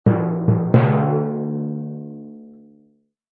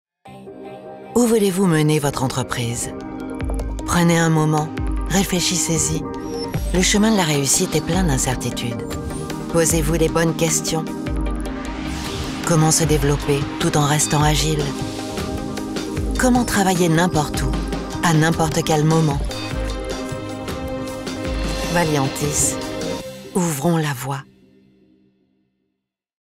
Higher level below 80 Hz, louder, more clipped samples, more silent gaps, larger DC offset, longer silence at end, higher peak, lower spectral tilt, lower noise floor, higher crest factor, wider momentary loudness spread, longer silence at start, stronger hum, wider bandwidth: second, -52 dBFS vs -32 dBFS; about the same, -20 LUFS vs -20 LUFS; neither; neither; neither; second, 0.85 s vs 2 s; about the same, -2 dBFS vs -4 dBFS; first, -12.5 dB/octave vs -4.5 dB/octave; second, -60 dBFS vs -77 dBFS; about the same, 18 dB vs 16 dB; first, 19 LU vs 11 LU; second, 0.05 s vs 0.25 s; neither; second, 4 kHz vs 16.5 kHz